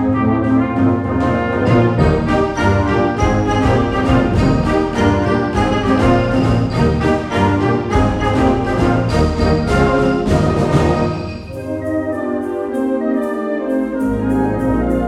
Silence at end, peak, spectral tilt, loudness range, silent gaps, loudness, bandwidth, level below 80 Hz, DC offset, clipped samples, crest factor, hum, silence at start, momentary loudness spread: 0 s; -2 dBFS; -7.5 dB/octave; 4 LU; none; -16 LUFS; 12 kHz; -26 dBFS; under 0.1%; under 0.1%; 14 dB; none; 0 s; 6 LU